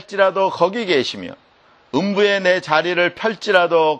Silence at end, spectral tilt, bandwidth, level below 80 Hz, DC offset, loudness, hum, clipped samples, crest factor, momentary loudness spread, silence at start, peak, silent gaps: 0 s; -4.5 dB/octave; 9 kHz; -66 dBFS; under 0.1%; -17 LUFS; none; under 0.1%; 18 dB; 9 LU; 0.1 s; 0 dBFS; none